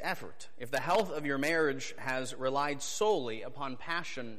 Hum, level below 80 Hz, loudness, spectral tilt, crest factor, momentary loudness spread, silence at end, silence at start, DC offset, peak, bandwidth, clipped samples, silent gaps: none; -72 dBFS; -33 LUFS; -3.5 dB/octave; 16 dB; 11 LU; 0 s; 0 s; 1%; -18 dBFS; 15.5 kHz; under 0.1%; none